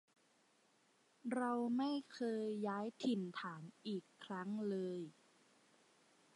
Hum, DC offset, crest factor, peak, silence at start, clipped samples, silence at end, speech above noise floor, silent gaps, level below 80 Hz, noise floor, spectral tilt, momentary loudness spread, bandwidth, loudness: none; under 0.1%; 16 dB; -28 dBFS; 1.25 s; under 0.1%; 1.25 s; 33 dB; none; under -90 dBFS; -75 dBFS; -6.5 dB/octave; 11 LU; 11.5 kHz; -43 LUFS